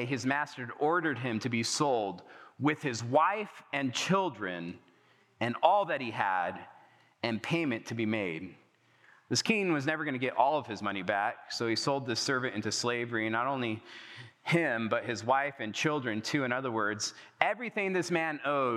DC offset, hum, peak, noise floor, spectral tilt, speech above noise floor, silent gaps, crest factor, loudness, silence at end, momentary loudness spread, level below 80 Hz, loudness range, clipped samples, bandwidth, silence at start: under 0.1%; none; -6 dBFS; -65 dBFS; -4 dB/octave; 34 dB; none; 26 dB; -31 LUFS; 0 s; 9 LU; under -90 dBFS; 2 LU; under 0.1%; 14 kHz; 0 s